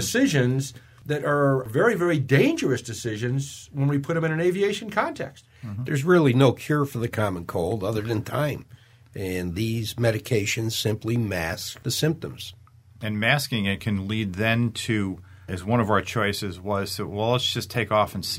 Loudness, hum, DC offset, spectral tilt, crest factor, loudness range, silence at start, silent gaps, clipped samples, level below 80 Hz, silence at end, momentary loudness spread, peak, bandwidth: -24 LUFS; none; under 0.1%; -5.5 dB/octave; 20 dB; 4 LU; 0 s; none; under 0.1%; -54 dBFS; 0 s; 12 LU; -4 dBFS; 16 kHz